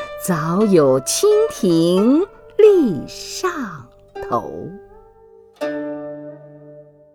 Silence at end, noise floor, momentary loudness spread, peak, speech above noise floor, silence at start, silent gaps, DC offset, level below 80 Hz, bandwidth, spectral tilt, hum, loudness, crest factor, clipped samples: 0.35 s; -47 dBFS; 20 LU; 0 dBFS; 31 dB; 0 s; none; under 0.1%; -52 dBFS; 19 kHz; -5.5 dB/octave; 50 Hz at -50 dBFS; -17 LUFS; 18 dB; under 0.1%